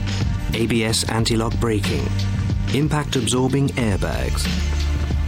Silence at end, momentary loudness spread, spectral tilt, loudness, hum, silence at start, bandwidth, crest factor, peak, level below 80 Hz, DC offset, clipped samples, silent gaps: 0 s; 4 LU; -5 dB/octave; -21 LUFS; none; 0 s; 16 kHz; 14 dB; -6 dBFS; -28 dBFS; under 0.1%; under 0.1%; none